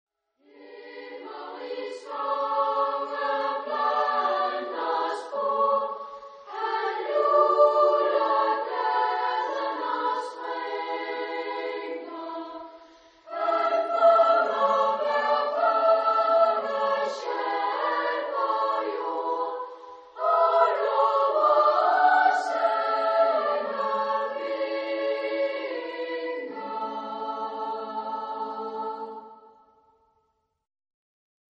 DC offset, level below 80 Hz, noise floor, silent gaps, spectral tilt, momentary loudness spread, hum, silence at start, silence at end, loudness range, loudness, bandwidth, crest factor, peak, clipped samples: under 0.1%; -84 dBFS; -73 dBFS; none; -3 dB/octave; 15 LU; none; 0.6 s; 2.25 s; 10 LU; -25 LUFS; 8.8 kHz; 18 dB; -8 dBFS; under 0.1%